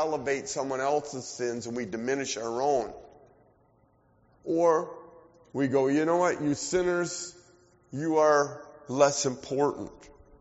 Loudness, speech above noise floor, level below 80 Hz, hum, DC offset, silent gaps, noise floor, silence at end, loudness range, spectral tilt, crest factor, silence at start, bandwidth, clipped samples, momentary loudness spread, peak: -28 LUFS; 37 dB; -64 dBFS; none; under 0.1%; none; -65 dBFS; 0.35 s; 5 LU; -4.5 dB/octave; 20 dB; 0 s; 8 kHz; under 0.1%; 16 LU; -8 dBFS